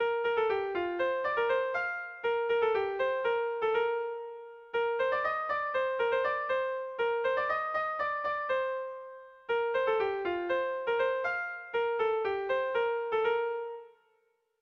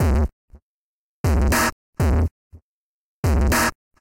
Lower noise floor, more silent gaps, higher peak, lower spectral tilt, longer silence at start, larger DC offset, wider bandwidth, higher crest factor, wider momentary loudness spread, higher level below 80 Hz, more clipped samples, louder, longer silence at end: second, -73 dBFS vs under -90 dBFS; second, none vs 0.33-0.48 s, 0.62-1.24 s, 1.72-1.93 s, 2.31-2.50 s, 2.62-3.23 s; second, -18 dBFS vs -10 dBFS; about the same, -5 dB/octave vs -5 dB/octave; about the same, 0 s vs 0 s; neither; second, 6.2 kHz vs 17 kHz; about the same, 12 dB vs 12 dB; about the same, 6 LU vs 8 LU; second, -70 dBFS vs -26 dBFS; neither; second, -31 LUFS vs -21 LUFS; first, 0.75 s vs 0.3 s